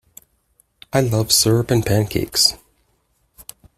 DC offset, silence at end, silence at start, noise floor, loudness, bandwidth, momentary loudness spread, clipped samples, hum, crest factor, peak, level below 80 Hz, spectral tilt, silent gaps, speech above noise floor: under 0.1%; 1.25 s; 0.95 s; -65 dBFS; -17 LUFS; 16 kHz; 6 LU; under 0.1%; none; 18 dB; -2 dBFS; -44 dBFS; -4 dB/octave; none; 47 dB